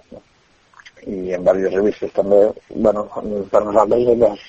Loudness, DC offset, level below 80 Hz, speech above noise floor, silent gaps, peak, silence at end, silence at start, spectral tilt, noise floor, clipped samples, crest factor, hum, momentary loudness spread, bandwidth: -17 LUFS; under 0.1%; -46 dBFS; 39 dB; none; 0 dBFS; 0.05 s; 0.1 s; -7.5 dB/octave; -56 dBFS; under 0.1%; 18 dB; none; 11 LU; 7.8 kHz